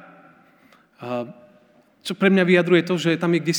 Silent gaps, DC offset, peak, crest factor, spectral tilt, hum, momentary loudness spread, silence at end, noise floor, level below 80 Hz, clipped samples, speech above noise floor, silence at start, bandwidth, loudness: none; under 0.1%; -4 dBFS; 18 dB; -5.5 dB/octave; none; 19 LU; 0 s; -56 dBFS; -76 dBFS; under 0.1%; 37 dB; 1 s; 19.5 kHz; -20 LUFS